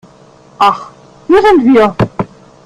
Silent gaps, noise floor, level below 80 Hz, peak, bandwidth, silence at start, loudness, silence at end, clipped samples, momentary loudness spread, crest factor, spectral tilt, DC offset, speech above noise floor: none; -41 dBFS; -40 dBFS; 0 dBFS; 12.5 kHz; 0.6 s; -10 LUFS; 0.4 s; under 0.1%; 16 LU; 12 dB; -7 dB/octave; under 0.1%; 33 dB